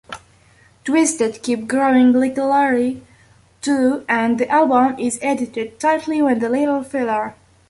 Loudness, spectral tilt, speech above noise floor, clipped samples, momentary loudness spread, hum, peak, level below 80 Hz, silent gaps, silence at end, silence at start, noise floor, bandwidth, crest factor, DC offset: -18 LUFS; -4 dB/octave; 35 dB; under 0.1%; 10 LU; none; -4 dBFS; -58 dBFS; none; 0.4 s; 0.1 s; -52 dBFS; 11.5 kHz; 14 dB; under 0.1%